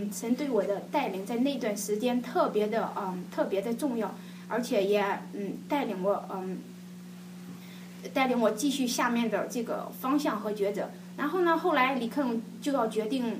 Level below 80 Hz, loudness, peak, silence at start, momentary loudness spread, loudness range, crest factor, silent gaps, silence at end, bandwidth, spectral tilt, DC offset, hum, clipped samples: -82 dBFS; -30 LUFS; -12 dBFS; 0 s; 15 LU; 3 LU; 18 dB; none; 0 s; 15.5 kHz; -5 dB/octave; under 0.1%; none; under 0.1%